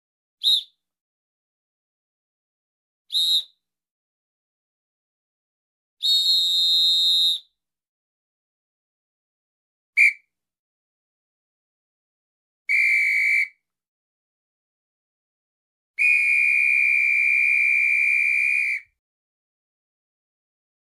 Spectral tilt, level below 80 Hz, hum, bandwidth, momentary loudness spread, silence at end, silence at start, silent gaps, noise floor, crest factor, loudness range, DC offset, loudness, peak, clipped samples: 5 dB/octave; -78 dBFS; none; 14 kHz; 9 LU; 2 s; 0.45 s; 1.01-3.05 s, 3.91-5.97 s, 7.89-9.93 s, 10.59-12.65 s, 13.88-15.94 s; -62 dBFS; 18 dB; 10 LU; under 0.1%; -18 LUFS; -8 dBFS; under 0.1%